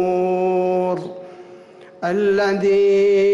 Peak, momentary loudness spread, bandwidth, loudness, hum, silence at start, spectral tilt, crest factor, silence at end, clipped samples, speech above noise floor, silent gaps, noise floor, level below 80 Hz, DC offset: -10 dBFS; 16 LU; 7.6 kHz; -18 LUFS; none; 0 s; -6.5 dB/octave; 8 dB; 0 s; under 0.1%; 27 dB; none; -42 dBFS; -60 dBFS; under 0.1%